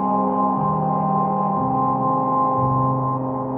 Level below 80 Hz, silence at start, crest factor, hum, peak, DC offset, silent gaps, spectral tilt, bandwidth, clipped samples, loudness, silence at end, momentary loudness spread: -52 dBFS; 0 s; 12 dB; none; -8 dBFS; under 0.1%; none; -11.5 dB/octave; 3.1 kHz; under 0.1%; -20 LUFS; 0 s; 2 LU